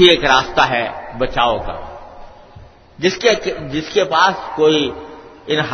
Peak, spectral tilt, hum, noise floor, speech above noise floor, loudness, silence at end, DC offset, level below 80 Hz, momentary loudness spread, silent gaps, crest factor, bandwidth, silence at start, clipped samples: 0 dBFS; -4 dB/octave; none; -41 dBFS; 26 dB; -16 LUFS; 0 s; under 0.1%; -38 dBFS; 19 LU; none; 16 dB; 6.6 kHz; 0 s; under 0.1%